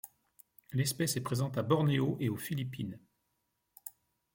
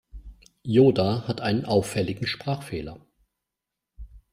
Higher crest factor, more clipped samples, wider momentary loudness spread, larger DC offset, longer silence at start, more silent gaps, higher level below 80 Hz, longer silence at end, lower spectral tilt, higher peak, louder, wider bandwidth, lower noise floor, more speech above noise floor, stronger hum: about the same, 20 dB vs 20 dB; neither; first, 20 LU vs 16 LU; neither; about the same, 0.05 s vs 0.15 s; neither; second, -68 dBFS vs -50 dBFS; first, 0.45 s vs 0.15 s; about the same, -5.5 dB/octave vs -6.5 dB/octave; second, -16 dBFS vs -6 dBFS; second, -33 LUFS vs -24 LUFS; about the same, 17 kHz vs 15.5 kHz; second, -81 dBFS vs -86 dBFS; second, 49 dB vs 62 dB; neither